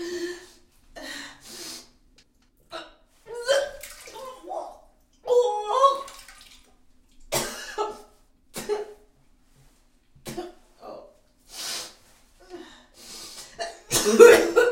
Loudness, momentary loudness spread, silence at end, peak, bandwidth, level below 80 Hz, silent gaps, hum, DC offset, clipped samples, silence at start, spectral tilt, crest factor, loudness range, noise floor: -22 LUFS; 23 LU; 0 s; 0 dBFS; 16.5 kHz; -56 dBFS; none; none; under 0.1%; under 0.1%; 0 s; -2.5 dB/octave; 26 dB; 13 LU; -61 dBFS